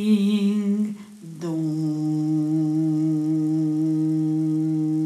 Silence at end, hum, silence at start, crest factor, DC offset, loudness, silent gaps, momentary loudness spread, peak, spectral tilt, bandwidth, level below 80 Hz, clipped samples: 0 s; none; 0 s; 12 dB; under 0.1%; -23 LUFS; none; 7 LU; -10 dBFS; -8.5 dB/octave; 11 kHz; -76 dBFS; under 0.1%